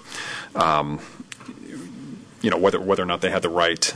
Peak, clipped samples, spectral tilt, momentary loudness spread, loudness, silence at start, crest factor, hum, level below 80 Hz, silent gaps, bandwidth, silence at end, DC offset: -6 dBFS; under 0.1%; -3.5 dB/octave; 19 LU; -22 LUFS; 0 s; 18 dB; none; -56 dBFS; none; 11 kHz; 0 s; under 0.1%